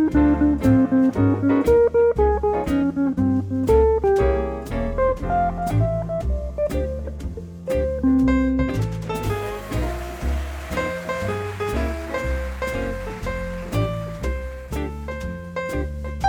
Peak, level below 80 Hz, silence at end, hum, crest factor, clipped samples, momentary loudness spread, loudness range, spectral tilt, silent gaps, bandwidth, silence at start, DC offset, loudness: -6 dBFS; -30 dBFS; 0 s; none; 16 dB; under 0.1%; 12 LU; 8 LU; -8 dB/octave; none; 20 kHz; 0 s; under 0.1%; -22 LUFS